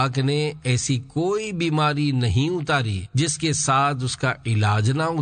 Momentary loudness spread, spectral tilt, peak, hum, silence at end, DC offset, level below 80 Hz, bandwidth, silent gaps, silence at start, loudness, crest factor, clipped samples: 4 LU; -5 dB/octave; -8 dBFS; none; 0 s; under 0.1%; -48 dBFS; 9.4 kHz; none; 0 s; -22 LUFS; 14 dB; under 0.1%